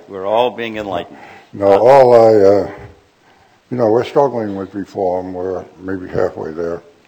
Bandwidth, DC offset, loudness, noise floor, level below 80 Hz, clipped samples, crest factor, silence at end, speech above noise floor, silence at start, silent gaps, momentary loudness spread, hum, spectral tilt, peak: 18 kHz; under 0.1%; -14 LUFS; -50 dBFS; -52 dBFS; 0.2%; 14 dB; 0.25 s; 36 dB; 0.1 s; none; 18 LU; none; -7 dB/octave; 0 dBFS